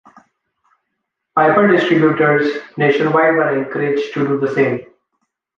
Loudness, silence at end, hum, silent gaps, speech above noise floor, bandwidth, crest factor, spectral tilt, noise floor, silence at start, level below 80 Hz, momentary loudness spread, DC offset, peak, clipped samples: -15 LUFS; 0.75 s; none; none; 61 dB; 7.4 kHz; 16 dB; -7.5 dB/octave; -75 dBFS; 1.35 s; -62 dBFS; 7 LU; under 0.1%; 0 dBFS; under 0.1%